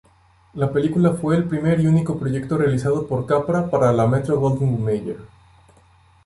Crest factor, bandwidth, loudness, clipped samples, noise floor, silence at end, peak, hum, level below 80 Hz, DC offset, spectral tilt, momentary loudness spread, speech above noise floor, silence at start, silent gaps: 16 dB; 11.5 kHz; -20 LUFS; under 0.1%; -55 dBFS; 1 s; -4 dBFS; none; -48 dBFS; under 0.1%; -8.5 dB/octave; 7 LU; 36 dB; 0.55 s; none